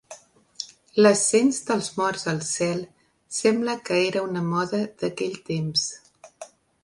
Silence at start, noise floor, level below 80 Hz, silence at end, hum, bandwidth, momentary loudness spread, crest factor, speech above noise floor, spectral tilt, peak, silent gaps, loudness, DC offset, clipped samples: 0.1 s; -48 dBFS; -66 dBFS; 0.35 s; none; 11.5 kHz; 18 LU; 20 dB; 24 dB; -4 dB/octave; -6 dBFS; none; -24 LUFS; under 0.1%; under 0.1%